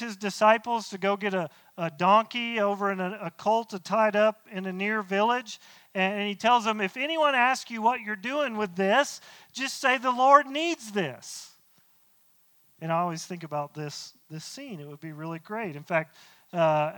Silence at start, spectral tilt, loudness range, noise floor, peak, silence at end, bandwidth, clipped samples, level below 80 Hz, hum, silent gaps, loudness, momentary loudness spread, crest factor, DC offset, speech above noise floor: 0 s; -4 dB/octave; 10 LU; -63 dBFS; -6 dBFS; 0 s; 19 kHz; under 0.1%; -80 dBFS; none; none; -26 LUFS; 18 LU; 22 dB; under 0.1%; 36 dB